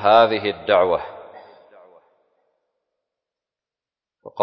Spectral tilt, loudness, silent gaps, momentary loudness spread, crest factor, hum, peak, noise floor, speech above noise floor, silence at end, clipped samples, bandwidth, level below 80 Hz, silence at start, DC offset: -6.5 dB/octave; -18 LUFS; none; 24 LU; 20 dB; none; -2 dBFS; under -90 dBFS; over 73 dB; 0 s; under 0.1%; 6 kHz; -60 dBFS; 0 s; under 0.1%